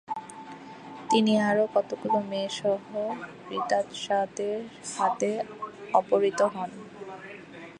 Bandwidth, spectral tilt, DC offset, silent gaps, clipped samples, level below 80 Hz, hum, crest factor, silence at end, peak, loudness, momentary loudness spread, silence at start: 11 kHz; -4.5 dB/octave; under 0.1%; none; under 0.1%; -72 dBFS; none; 22 dB; 0 s; -8 dBFS; -28 LUFS; 19 LU; 0.1 s